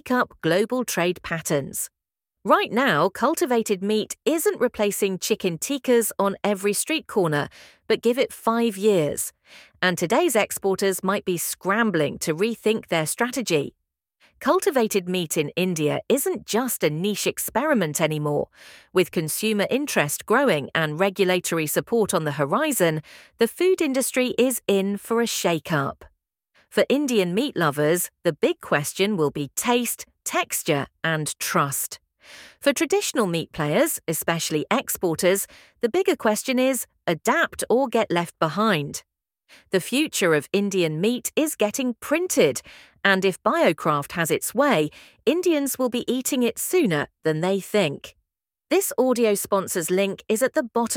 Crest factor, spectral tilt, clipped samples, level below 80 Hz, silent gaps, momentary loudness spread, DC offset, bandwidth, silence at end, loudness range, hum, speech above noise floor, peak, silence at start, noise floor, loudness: 22 dB; -4 dB/octave; under 0.1%; -62 dBFS; none; 5 LU; under 0.1%; 18 kHz; 0 s; 2 LU; none; 59 dB; -2 dBFS; 0.05 s; -82 dBFS; -23 LUFS